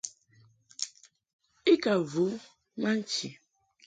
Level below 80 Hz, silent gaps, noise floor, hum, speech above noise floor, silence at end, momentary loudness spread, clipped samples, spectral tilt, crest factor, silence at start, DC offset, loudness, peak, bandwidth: -74 dBFS; 1.33-1.39 s; -63 dBFS; none; 33 dB; 0.55 s; 17 LU; under 0.1%; -4 dB/octave; 20 dB; 0.05 s; under 0.1%; -30 LUFS; -12 dBFS; 9.4 kHz